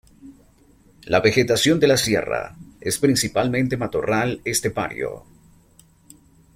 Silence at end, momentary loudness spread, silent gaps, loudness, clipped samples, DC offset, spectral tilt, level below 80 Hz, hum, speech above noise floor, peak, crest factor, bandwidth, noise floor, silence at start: 1.35 s; 12 LU; none; -20 LUFS; under 0.1%; under 0.1%; -4 dB/octave; -50 dBFS; none; 34 dB; -2 dBFS; 20 dB; 16.5 kHz; -54 dBFS; 0.25 s